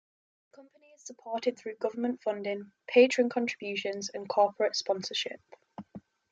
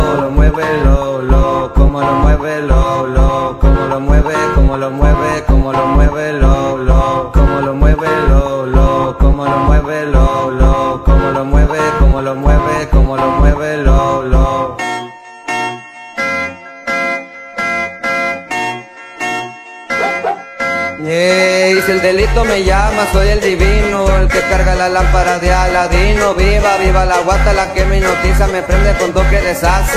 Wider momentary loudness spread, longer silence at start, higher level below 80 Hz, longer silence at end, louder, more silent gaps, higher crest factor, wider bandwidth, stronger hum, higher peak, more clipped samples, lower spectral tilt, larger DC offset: first, 24 LU vs 7 LU; first, 0.6 s vs 0 s; second, -82 dBFS vs -14 dBFS; first, 0.35 s vs 0 s; second, -30 LUFS vs -13 LUFS; neither; first, 22 dB vs 12 dB; second, 7.8 kHz vs 14 kHz; neither; second, -10 dBFS vs 0 dBFS; neither; second, -3.5 dB/octave vs -6 dB/octave; neither